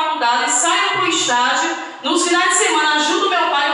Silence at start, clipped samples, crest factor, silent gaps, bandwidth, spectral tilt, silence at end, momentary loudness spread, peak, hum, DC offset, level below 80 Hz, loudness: 0 s; under 0.1%; 14 dB; none; 11.5 kHz; 0 dB/octave; 0 s; 5 LU; -2 dBFS; none; under 0.1%; -76 dBFS; -15 LUFS